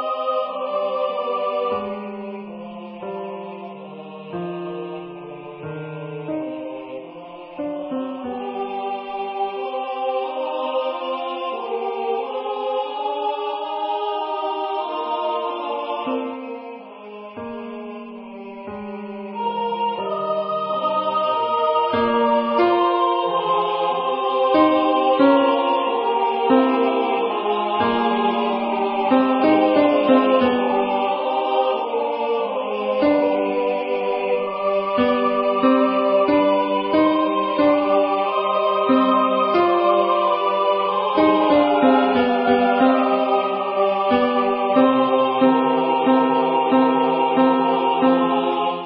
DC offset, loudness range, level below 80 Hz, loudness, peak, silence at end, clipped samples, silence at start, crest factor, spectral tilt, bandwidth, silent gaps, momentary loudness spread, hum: under 0.1%; 13 LU; -60 dBFS; -19 LUFS; -4 dBFS; 0 s; under 0.1%; 0 s; 16 dB; -10 dB/octave; 5.6 kHz; none; 16 LU; none